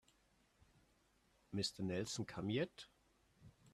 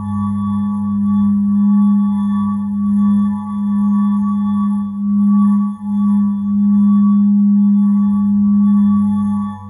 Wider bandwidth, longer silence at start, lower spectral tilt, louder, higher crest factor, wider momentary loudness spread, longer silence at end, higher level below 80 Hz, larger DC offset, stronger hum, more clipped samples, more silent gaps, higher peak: first, 14 kHz vs 3.6 kHz; first, 1.5 s vs 0 s; second, -4.5 dB/octave vs -10.5 dB/octave; second, -43 LUFS vs -14 LUFS; first, 20 dB vs 8 dB; first, 11 LU vs 6 LU; about the same, 0.05 s vs 0 s; second, -74 dBFS vs -50 dBFS; neither; neither; neither; neither; second, -28 dBFS vs -6 dBFS